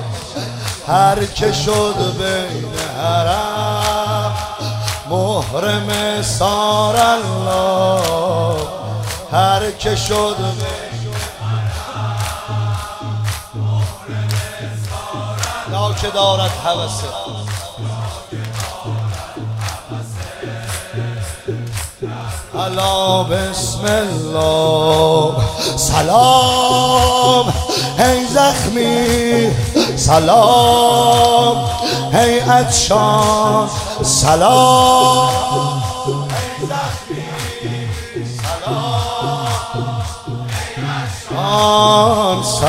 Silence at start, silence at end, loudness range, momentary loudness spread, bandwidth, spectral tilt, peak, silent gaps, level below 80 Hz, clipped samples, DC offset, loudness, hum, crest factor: 0 s; 0 s; 10 LU; 14 LU; 16 kHz; -4 dB/octave; 0 dBFS; none; -34 dBFS; under 0.1%; under 0.1%; -15 LUFS; none; 16 dB